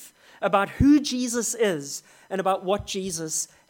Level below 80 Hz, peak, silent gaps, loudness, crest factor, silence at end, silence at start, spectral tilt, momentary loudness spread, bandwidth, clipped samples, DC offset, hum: -44 dBFS; -6 dBFS; none; -24 LUFS; 18 dB; 0.25 s; 0 s; -4 dB/octave; 12 LU; 17.5 kHz; under 0.1%; under 0.1%; none